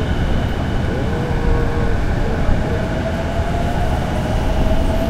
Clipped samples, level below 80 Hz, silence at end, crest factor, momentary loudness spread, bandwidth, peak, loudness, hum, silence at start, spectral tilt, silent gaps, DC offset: under 0.1%; -20 dBFS; 0 s; 14 dB; 2 LU; 13.5 kHz; -2 dBFS; -20 LUFS; none; 0 s; -7 dB/octave; none; under 0.1%